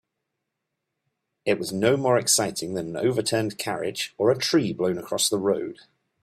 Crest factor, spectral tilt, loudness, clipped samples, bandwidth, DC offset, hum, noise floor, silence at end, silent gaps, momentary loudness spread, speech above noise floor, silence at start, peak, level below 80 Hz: 18 dB; -3.5 dB/octave; -24 LUFS; under 0.1%; 16 kHz; under 0.1%; none; -82 dBFS; 0.5 s; none; 9 LU; 57 dB; 1.45 s; -6 dBFS; -64 dBFS